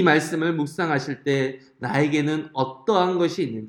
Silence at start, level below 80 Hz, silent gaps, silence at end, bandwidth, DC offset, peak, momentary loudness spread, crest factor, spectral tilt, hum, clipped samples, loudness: 0 s; -68 dBFS; none; 0 s; 17 kHz; under 0.1%; -4 dBFS; 6 LU; 18 dB; -6 dB/octave; none; under 0.1%; -23 LUFS